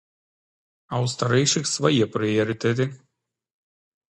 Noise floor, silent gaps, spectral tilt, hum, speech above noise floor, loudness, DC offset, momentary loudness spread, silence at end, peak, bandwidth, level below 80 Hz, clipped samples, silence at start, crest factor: -75 dBFS; none; -4.5 dB/octave; none; 53 dB; -23 LUFS; under 0.1%; 7 LU; 1.15 s; -4 dBFS; 11.5 kHz; -62 dBFS; under 0.1%; 0.9 s; 20 dB